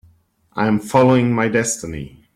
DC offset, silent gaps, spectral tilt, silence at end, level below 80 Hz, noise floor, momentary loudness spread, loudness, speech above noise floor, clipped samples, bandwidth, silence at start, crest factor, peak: under 0.1%; none; -5.5 dB/octave; 0.25 s; -48 dBFS; -55 dBFS; 17 LU; -17 LUFS; 39 dB; under 0.1%; 15 kHz; 0.55 s; 16 dB; -2 dBFS